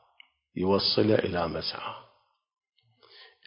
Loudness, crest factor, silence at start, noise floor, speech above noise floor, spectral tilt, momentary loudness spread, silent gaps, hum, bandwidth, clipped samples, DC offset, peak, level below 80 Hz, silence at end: -27 LUFS; 22 dB; 0.55 s; -65 dBFS; 38 dB; -9 dB/octave; 17 LU; none; none; 5.6 kHz; under 0.1%; under 0.1%; -8 dBFS; -54 dBFS; 0.2 s